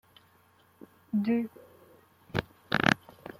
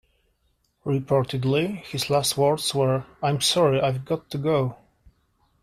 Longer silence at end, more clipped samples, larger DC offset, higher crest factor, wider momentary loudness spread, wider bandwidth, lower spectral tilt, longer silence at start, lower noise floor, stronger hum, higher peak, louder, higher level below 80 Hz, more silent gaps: second, 0.1 s vs 0.9 s; neither; neither; first, 28 dB vs 16 dB; about the same, 10 LU vs 9 LU; about the same, 16 kHz vs 15 kHz; about the same, -5.5 dB/octave vs -5 dB/octave; first, 1.15 s vs 0.85 s; second, -63 dBFS vs -69 dBFS; neither; first, -4 dBFS vs -8 dBFS; second, -30 LUFS vs -23 LUFS; about the same, -60 dBFS vs -58 dBFS; neither